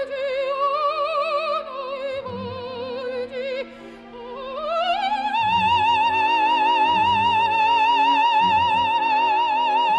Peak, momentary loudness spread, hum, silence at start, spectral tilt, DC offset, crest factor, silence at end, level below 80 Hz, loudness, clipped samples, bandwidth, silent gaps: -10 dBFS; 14 LU; none; 0 s; -4 dB/octave; under 0.1%; 12 dB; 0 s; -58 dBFS; -20 LUFS; under 0.1%; 9.2 kHz; none